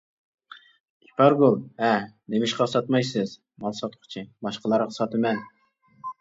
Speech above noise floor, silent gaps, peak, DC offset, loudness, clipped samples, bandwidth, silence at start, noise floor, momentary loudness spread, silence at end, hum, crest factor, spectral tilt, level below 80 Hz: 36 dB; none; -4 dBFS; under 0.1%; -24 LUFS; under 0.1%; 7.8 kHz; 1.2 s; -60 dBFS; 15 LU; 0.1 s; none; 22 dB; -6 dB/octave; -70 dBFS